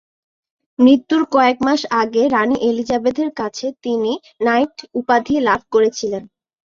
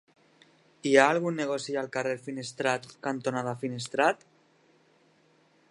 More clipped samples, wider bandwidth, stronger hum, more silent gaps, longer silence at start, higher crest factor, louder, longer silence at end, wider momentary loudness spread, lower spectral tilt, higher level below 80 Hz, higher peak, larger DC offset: neither; second, 7.4 kHz vs 11.5 kHz; neither; neither; about the same, 0.8 s vs 0.85 s; second, 16 dB vs 26 dB; first, -17 LUFS vs -28 LUFS; second, 0.4 s vs 1.55 s; second, 10 LU vs 13 LU; about the same, -4.5 dB/octave vs -4.5 dB/octave; first, -56 dBFS vs -80 dBFS; about the same, -2 dBFS vs -4 dBFS; neither